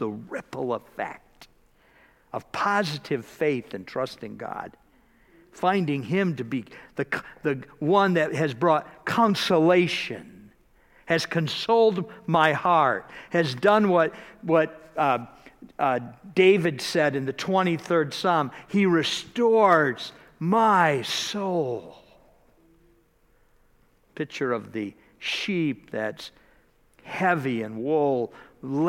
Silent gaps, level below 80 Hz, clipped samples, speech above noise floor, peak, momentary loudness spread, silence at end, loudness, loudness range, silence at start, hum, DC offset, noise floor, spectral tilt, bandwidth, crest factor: none; -64 dBFS; under 0.1%; 38 dB; -4 dBFS; 15 LU; 0 s; -24 LUFS; 8 LU; 0 s; none; under 0.1%; -62 dBFS; -5.5 dB/octave; 16.5 kHz; 22 dB